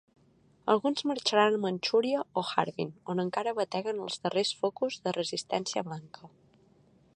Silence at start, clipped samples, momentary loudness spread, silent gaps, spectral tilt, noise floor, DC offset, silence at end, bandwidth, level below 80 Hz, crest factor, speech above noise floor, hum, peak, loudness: 0.65 s; under 0.1%; 8 LU; none; -4 dB/octave; -64 dBFS; under 0.1%; 0.9 s; 10.5 kHz; -78 dBFS; 22 dB; 34 dB; none; -10 dBFS; -30 LUFS